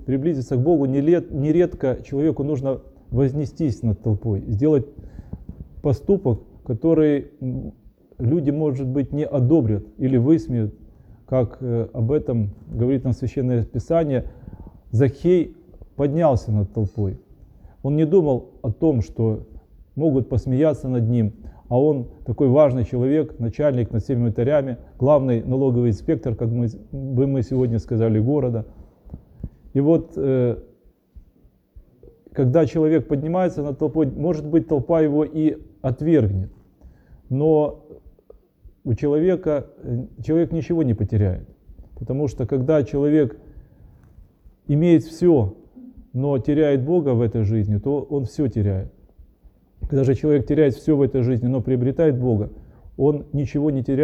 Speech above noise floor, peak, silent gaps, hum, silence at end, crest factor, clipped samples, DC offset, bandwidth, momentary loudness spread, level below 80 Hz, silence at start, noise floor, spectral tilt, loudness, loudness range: 36 dB; -4 dBFS; none; none; 0 s; 18 dB; under 0.1%; under 0.1%; 8 kHz; 11 LU; -42 dBFS; 0 s; -56 dBFS; -10 dB/octave; -21 LUFS; 3 LU